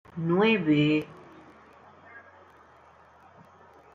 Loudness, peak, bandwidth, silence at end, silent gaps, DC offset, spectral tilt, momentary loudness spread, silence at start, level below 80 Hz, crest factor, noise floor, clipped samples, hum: -24 LUFS; -12 dBFS; 7.4 kHz; 1.75 s; none; under 0.1%; -8 dB/octave; 27 LU; 0.15 s; -70 dBFS; 18 dB; -55 dBFS; under 0.1%; none